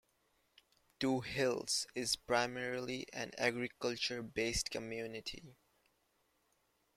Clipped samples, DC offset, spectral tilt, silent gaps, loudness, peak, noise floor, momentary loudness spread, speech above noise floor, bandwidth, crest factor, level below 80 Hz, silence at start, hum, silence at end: under 0.1%; under 0.1%; -3 dB/octave; none; -38 LUFS; -18 dBFS; -78 dBFS; 9 LU; 40 dB; 16 kHz; 22 dB; -62 dBFS; 1 s; none; 1.45 s